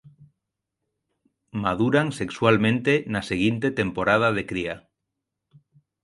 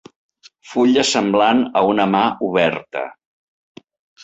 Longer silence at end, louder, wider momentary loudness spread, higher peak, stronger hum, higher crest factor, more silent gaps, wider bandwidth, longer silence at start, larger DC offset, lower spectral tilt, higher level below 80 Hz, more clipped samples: first, 1.25 s vs 1.1 s; second, -23 LUFS vs -17 LUFS; second, 9 LU vs 12 LU; about the same, -4 dBFS vs -2 dBFS; neither; about the same, 22 dB vs 18 dB; neither; first, 11.5 kHz vs 8 kHz; second, 0.2 s vs 0.65 s; neither; first, -6.5 dB/octave vs -4 dB/octave; first, -54 dBFS vs -60 dBFS; neither